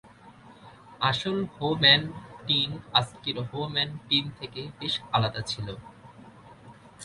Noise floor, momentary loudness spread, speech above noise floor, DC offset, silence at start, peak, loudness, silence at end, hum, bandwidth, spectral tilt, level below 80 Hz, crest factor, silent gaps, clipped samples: -51 dBFS; 18 LU; 24 dB; under 0.1%; 0.05 s; -6 dBFS; -26 LUFS; 0 s; none; 11.5 kHz; -4.5 dB/octave; -58 dBFS; 24 dB; none; under 0.1%